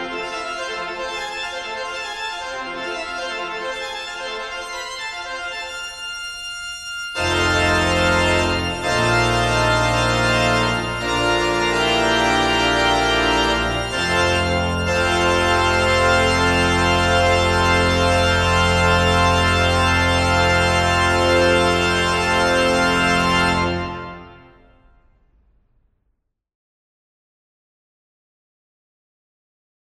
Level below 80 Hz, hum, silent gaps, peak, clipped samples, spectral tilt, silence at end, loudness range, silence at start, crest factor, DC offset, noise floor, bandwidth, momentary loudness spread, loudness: -34 dBFS; none; none; -4 dBFS; under 0.1%; -4 dB/octave; 5.55 s; 11 LU; 0 s; 16 dB; under 0.1%; -71 dBFS; 13.5 kHz; 11 LU; -18 LUFS